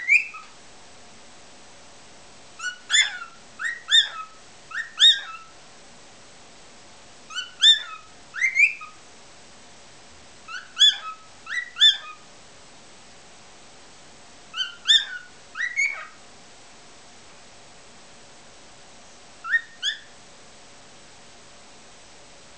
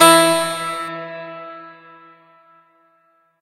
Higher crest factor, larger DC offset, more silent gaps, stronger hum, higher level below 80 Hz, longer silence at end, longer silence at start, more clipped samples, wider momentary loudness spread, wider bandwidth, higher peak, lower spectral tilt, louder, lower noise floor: about the same, 22 dB vs 20 dB; first, 0.3% vs under 0.1%; neither; neither; about the same, -68 dBFS vs -70 dBFS; first, 2.55 s vs 1.7 s; about the same, 0 s vs 0 s; neither; about the same, 24 LU vs 24 LU; second, 8 kHz vs 16 kHz; second, -4 dBFS vs 0 dBFS; second, 2.5 dB/octave vs -2 dB/octave; second, -20 LUFS vs -17 LUFS; second, -48 dBFS vs -60 dBFS